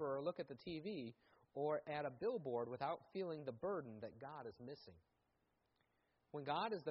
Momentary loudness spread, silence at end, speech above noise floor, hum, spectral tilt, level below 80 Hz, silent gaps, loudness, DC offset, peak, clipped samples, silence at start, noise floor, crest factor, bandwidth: 12 LU; 0 s; 38 dB; none; -4.5 dB/octave; -82 dBFS; none; -47 LUFS; under 0.1%; -30 dBFS; under 0.1%; 0 s; -84 dBFS; 18 dB; 5.6 kHz